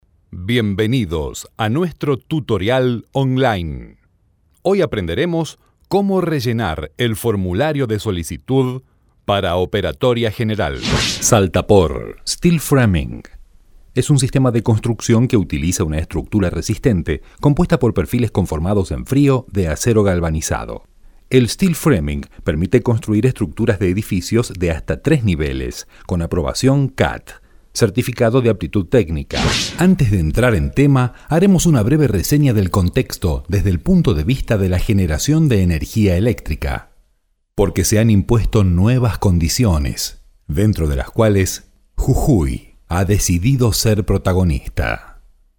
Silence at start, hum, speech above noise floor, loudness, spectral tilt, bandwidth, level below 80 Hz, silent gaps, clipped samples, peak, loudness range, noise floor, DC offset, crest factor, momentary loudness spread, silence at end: 0.3 s; none; 46 dB; -17 LUFS; -6 dB/octave; over 20 kHz; -30 dBFS; none; under 0.1%; 0 dBFS; 4 LU; -62 dBFS; under 0.1%; 16 dB; 9 LU; 0.4 s